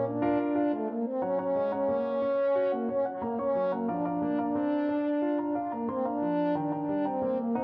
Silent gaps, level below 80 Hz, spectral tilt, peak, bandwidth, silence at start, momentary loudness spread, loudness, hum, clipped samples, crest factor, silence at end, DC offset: none; -66 dBFS; -10.5 dB/octave; -16 dBFS; 5 kHz; 0 s; 4 LU; -29 LUFS; none; under 0.1%; 12 dB; 0 s; under 0.1%